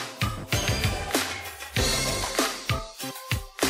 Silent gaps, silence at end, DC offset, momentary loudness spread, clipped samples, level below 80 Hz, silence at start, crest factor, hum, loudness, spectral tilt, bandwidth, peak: none; 0 s; under 0.1%; 7 LU; under 0.1%; -38 dBFS; 0 s; 20 dB; none; -27 LUFS; -3 dB/octave; 16 kHz; -8 dBFS